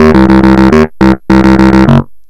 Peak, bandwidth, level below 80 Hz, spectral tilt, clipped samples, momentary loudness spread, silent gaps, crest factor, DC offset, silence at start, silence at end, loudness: 0 dBFS; 10 kHz; -18 dBFS; -8 dB/octave; 9%; 3 LU; none; 4 dB; under 0.1%; 0 s; 0.1 s; -5 LUFS